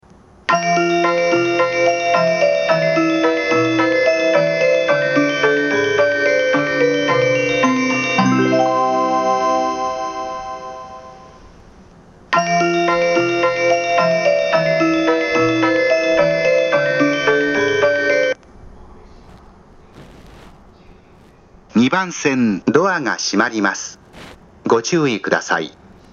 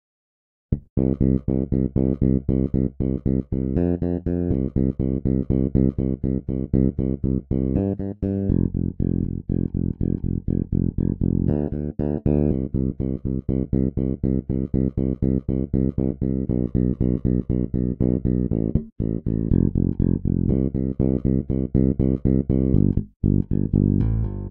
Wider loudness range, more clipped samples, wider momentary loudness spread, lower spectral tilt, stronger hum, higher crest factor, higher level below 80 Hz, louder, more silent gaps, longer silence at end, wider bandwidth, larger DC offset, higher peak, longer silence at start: first, 7 LU vs 2 LU; neither; about the same, 6 LU vs 5 LU; second, -4.5 dB/octave vs -14.5 dB/octave; neither; about the same, 16 dB vs 16 dB; second, -52 dBFS vs -30 dBFS; first, -16 LUFS vs -23 LUFS; second, none vs 0.90-0.96 s, 18.92-18.96 s, 23.16-23.20 s; first, 0.4 s vs 0 s; first, 7.6 kHz vs 2.6 kHz; neither; first, 0 dBFS vs -4 dBFS; second, 0.5 s vs 0.7 s